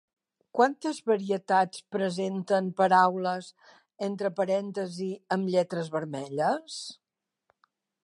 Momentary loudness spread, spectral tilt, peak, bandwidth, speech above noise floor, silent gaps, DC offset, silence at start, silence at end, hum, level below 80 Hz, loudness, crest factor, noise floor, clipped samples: 12 LU; -5.5 dB/octave; -8 dBFS; 11.5 kHz; 46 dB; none; under 0.1%; 0.55 s; 1.1 s; none; -82 dBFS; -28 LUFS; 20 dB; -74 dBFS; under 0.1%